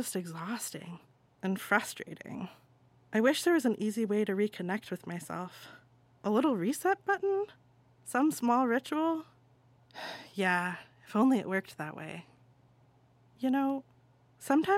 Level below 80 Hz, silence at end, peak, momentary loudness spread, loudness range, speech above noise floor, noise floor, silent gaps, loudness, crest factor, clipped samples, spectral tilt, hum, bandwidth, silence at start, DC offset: -80 dBFS; 0 s; -10 dBFS; 17 LU; 3 LU; 33 dB; -64 dBFS; none; -32 LUFS; 22 dB; under 0.1%; -5 dB/octave; none; 16.5 kHz; 0 s; under 0.1%